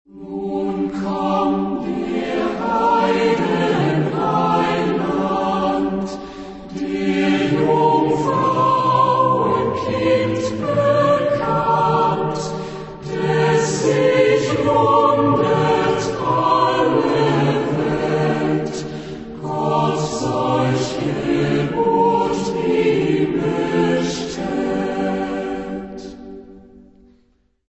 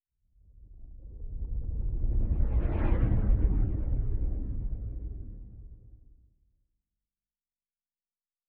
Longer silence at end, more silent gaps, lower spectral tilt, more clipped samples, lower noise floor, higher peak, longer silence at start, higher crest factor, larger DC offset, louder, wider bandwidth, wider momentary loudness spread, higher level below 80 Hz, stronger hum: second, 0.9 s vs 2.5 s; neither; second, -6 dB/octave vs -10.5 dB/octave; neither; second, -59 dBFS vs under -90 dBFS; first, -2 dBFS vs -12 dBFS; second, 0.15 s vs 0.6 s; about the same, 16 dB vs 18 dB; neither; first, -18 LUFS vs -32 LUFS; first, 8.4 kHz vs 3 kHz; second, 11 LU vs 22 LU; second, -46 dBFS vs -32 dBFS; neither